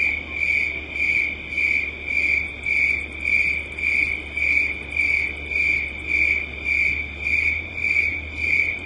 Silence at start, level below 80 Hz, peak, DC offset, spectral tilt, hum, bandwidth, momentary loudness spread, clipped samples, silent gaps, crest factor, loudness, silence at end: 0 s; -42 dBFS; -8 dBFS; under 0.1%; -4 dB/octave; none; 11 kHz; 4 LU; under 0.1%; none; 16 dB; -20 LUFS; 0 s